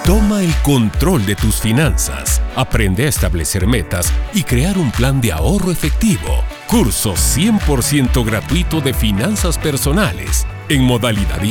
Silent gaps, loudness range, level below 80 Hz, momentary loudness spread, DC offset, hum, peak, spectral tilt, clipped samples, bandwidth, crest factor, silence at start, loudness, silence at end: none; 1 LU; -20 dBFS; 4 LU; under 0.1%; none; 0 dBFS; -5 dB/octave; under 0.1%; 19 kHz; 14 dB; 0 s; -15 LUFS; 0 s